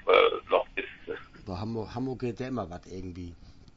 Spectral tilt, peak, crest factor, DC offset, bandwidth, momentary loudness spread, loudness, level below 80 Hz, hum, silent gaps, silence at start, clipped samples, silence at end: -6.5 dB/octave; -6 dBFS; 24 dB; under 0.1%; 7.6 kHz; 18 LU; -31 LUFS; -54 dBFS; none; none; 0.05 s; under 0.1%; 0.05 s